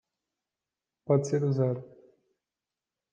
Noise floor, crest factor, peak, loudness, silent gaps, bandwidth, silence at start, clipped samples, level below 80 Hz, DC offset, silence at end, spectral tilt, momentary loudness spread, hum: under -90 dBFS; 20 dB; -12 dBFS; -28 LUFS; none; 9 kHz; 1.1 s; under 0.1%; -80 dBFS; under 0.1%; 1.3 s; -8 dB/octave; 12 LU; none